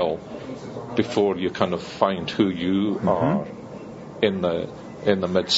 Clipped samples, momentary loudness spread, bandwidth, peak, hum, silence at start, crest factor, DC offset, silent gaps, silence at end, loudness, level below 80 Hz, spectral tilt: under 0.1%; 14 LU; 8 kHz; -2 dBFS; none; 0 s; 20 dB; under 0.1%; none; 0 s; -24 LUFS; -56 dBFS; -4.5 dB/octave